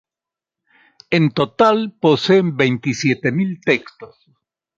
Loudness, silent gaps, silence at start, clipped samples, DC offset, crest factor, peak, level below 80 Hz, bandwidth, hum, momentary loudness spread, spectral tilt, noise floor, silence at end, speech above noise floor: -17 LUFS; none; 1.1 s; under 0.1%; under 0.1%; 16 dB; -2 dBFS; -60 dBFS; 7.6 kHz; none; 5 LU; -6 dB/octave; -88 dBFS; 0.7 s; 71 dB